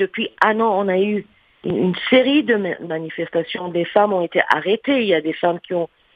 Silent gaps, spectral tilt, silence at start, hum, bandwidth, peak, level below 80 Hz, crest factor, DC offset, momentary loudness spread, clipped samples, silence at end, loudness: none; -7.5 dB/octave; 0 s; none; 8 kHz; 0 dBFS; -62 dBFS; 18 dB; under 0.1%; 9 LU; under 0.1%; 0.3 s; -19 LUFS